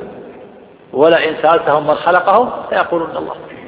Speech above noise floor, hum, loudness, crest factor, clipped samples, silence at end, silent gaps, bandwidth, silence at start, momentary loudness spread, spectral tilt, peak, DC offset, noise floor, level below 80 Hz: 26 dB; none; -13 LUFS; 14 dB; under 0.1%; 0 s; none; 5.2 kHz; 0 s; 14 LU; -8.5 dB/octave; 0 dBFS; under 0.1%; -39 dBFS; -54 dBFS